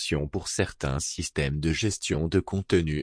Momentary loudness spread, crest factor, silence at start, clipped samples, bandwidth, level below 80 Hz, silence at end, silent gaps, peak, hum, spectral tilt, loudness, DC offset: 4 LU; 18 dB; 0 s; under 0.1%; 10.5 kHz; -40 dBFS; 0 s; none; -10 dBFS; none; -4.5 dB/octave; -28 LUFS; under 0.1%